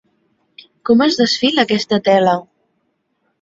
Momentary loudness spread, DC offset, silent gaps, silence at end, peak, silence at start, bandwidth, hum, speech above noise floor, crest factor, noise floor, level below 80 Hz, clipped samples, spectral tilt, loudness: 5 LU; under 0.1%; none; 1 s; -2 dBFS; 0.85 s; 7.8 kHz; none; 53 dB; 16 dB; -67 dBFS; -58 dBFS; under 0.1%; -4.5 dB/octave; -14 LUFS